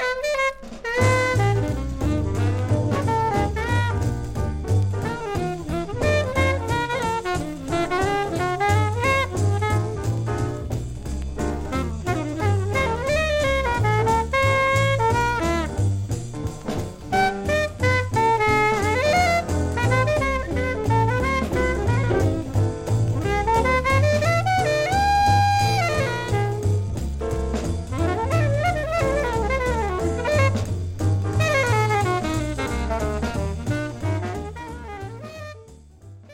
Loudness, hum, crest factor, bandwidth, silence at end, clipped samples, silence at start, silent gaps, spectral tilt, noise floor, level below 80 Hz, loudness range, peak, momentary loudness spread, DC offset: -22 LUFS; none; 14 dB; 16 kHz; 0 s; under 0.1%; 0 s; none; -6 dB/octave; -45 dBFS; -34 dBFS; 4 LU; -6 dBFS; 9 LU; under 0.1%